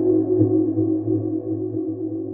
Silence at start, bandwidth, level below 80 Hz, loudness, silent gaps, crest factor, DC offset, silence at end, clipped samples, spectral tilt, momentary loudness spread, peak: 0 s; 1.7 kHz; -60 dBFS; -22 LUFS; none; 14 dB; under 0.1%; 0 s; under 0.1%; -16.5 dB/octave; 8 LU; -6 dBFS